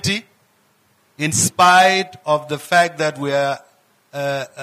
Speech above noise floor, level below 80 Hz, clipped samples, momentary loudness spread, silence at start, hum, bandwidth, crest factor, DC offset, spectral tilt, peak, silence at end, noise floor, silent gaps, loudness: 42 dB; -64 dBFS; under 0.1%; 13 LU; 0.05 s; none; 15.5 kHz; 14 dB; under 0.1%; -3 dB/octave; -4 dBFS; 0 s; -59 dBFS; none; -17 LUFS